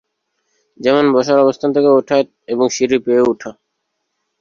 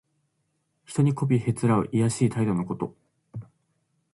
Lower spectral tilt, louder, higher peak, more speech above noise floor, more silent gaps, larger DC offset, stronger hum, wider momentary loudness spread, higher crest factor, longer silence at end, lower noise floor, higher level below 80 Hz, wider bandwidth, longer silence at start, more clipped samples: second, -5 dB/octave vs -7.5 dB/octave; first, -14 LUFS vs -25 LUFS; first, -2 dBFS vs -10 dBFS; first, 59 dB vs 51 dB; neither; neither; neither; second, 8 LU vs 19 LU; about the same, 14 dB vs 18 dB; first, 0.9 s vs 0.7 s; about the same, -72 dBFS vs -74 dBFS; about the same, -58 dBFS vs -60 dBFS; second, 7.4 kHz vs 11.5 kHz; about the same, 0.8 s vs 0.9 s; neither